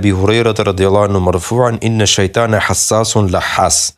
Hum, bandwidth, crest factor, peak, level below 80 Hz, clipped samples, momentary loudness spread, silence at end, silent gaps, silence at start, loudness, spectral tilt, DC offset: none; 14 kHz; 12 dB; 0 dBFS; -42 dBFS; under 0.1%; 3 LU; 0.05 s; none; 0 s; -12 LUFS; -4 dB/octave; under 0.1%